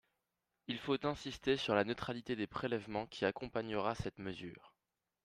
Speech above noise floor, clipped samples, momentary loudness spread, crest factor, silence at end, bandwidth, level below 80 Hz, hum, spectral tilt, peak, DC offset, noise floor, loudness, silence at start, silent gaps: 50 dB; under 0.1%; 11 LU; 22 dB; 0.55 s; 13.5 kHz; -64 dBFS; none; -5.5 dB/octave; -18 dBFS; under 0.1%; -89 dBFS; -39 LUFS; 0.7 s; none